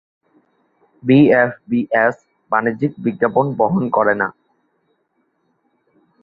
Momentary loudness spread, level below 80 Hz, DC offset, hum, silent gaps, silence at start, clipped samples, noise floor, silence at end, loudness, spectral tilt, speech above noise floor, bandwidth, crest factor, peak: 9 LU; -60 dBFS; under 0.1%; none; none; 1.05 s; under 0.1%; -66 dBFS; 1.9 s; -17 LUFS; -9.5 dB/octave; 51 dB; 5 kHz; 18 dB; -2 dBFS